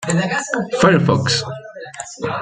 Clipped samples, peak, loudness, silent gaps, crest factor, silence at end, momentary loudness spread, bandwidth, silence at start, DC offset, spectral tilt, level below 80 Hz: under 0.1%; -2 dBFS; -17 LUFS; none; 16 dB; 0 s; 18 LU; 9.4 kHz; 0 s; under 0.1%; -5 dB/octave; -52 dBFS